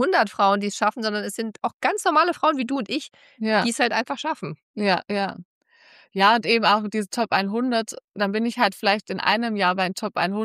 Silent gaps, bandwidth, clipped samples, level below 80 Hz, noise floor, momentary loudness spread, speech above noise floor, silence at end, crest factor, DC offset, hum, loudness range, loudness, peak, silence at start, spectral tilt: 1.73-1.80 s, 4.63-4.74 s, 5.45-5.61 s, 8.04-8.08 s; 15 kHz; under 0.1%; -74 dBFS; -54 dBFS; 11 LU; 31 dB; 0 s; 18 dB; under 0.1%; none; 3 LU; -22 LUFS; -6 dBFS; 0 s; -4 dB/octave